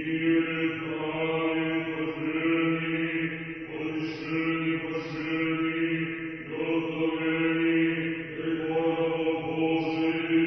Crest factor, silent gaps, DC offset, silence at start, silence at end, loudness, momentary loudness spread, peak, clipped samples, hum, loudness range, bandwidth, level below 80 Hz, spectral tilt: 14 dB; none; under 0.1%; 0 s; 0 s; -28 LUFS; 7 LU; -14 dBFS; under 0.1%; none; 2 LU; 6 kHz; -62 dBFS; -8 dB/octave